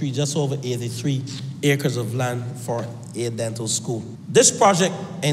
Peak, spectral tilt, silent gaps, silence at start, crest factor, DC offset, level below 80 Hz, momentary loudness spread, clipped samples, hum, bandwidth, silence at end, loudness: -4 dBFS; -4 dB/octave; none; 0 s; 18 dB; under 0.1%; -64 dBFS; 13 LU; under 0.1%; none; 15.5 kHz; 0 s; -22 LUFS